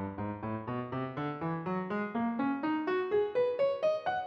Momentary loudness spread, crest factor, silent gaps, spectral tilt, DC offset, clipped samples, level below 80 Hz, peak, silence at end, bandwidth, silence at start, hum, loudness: 7 LU; 12 dB; none; -8.5 dB/octave; under 0.1%; under 0.1%; -70 dBFS; -20 dBFS; 0 s; 6.6 kHz; 0 s; none; -33 LUFS